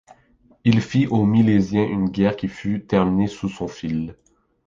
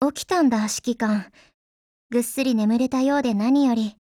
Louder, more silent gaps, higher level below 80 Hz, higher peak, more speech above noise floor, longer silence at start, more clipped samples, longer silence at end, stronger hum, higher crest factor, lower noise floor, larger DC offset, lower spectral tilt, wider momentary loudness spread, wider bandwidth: about the same, -21 LUFS vs -22 LUFS; second, none vs 1.54-2.10 s; first, -48 dBFS vs -60 dBFS; first, -2 dBFS vs -8 dBFS; second, 37 dB vs over 69 dB; first, 0.65 s vs 0 s; neither; first, 0.55 s vs 0.1 s; neither; about the same, 18 dB vs 14 dB; second, -57 dBFS vs under -90 dBFS; neither; first, -8 dB/octave vs -4.5 dB/octave; first, 11 LU vs 6 LU; second, 7.6 kHz vs 16.5 kHz